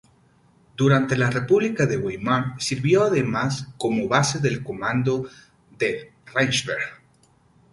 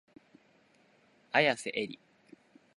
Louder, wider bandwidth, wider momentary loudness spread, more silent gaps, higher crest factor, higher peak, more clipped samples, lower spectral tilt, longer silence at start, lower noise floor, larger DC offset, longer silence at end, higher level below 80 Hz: first, -22 LUFS vs -31 LUFS; about the same, 11.5 kHz vs 11.5 kHz; second, 9 LU vs 15 LU; neither; second, 20 dB vs 26 dB; first, -2 dBFS vs -10 dBFS; neither; first, -5 dB/octave vs -3.5 dB/octave; second, 0.8 s vs 1.35 s; second, -59 dBFS vs -66 dBFS; neither; about the same, 0.8 s vs 0.8 s; first, -56 dBFS vs -82 dBFS